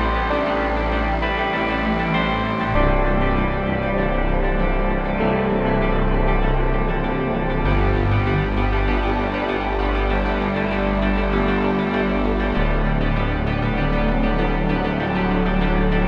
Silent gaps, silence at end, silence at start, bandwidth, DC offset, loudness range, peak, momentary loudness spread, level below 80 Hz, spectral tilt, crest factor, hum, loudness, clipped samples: none; 0 s; 0 s; 5.6 kHz; under 0.1%; 1 LU; -4 dBFS; 2 LU; -24 dBFS; -8.5 dB/octave; 14 dB; none; -21 LUFS; under 0.1%